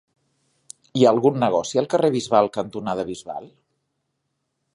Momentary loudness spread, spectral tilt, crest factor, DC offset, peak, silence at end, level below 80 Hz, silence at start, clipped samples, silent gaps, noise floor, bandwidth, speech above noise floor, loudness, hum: 14 LU; -6 dB/octave; 20 dB; under 0.1%; -2 dBFS; 1.25 s; -62 dBFS; 0.95 s; under 0.1%; none; -76 dBFS; 11.5 kHz; 56 dB; -21 LUFS; none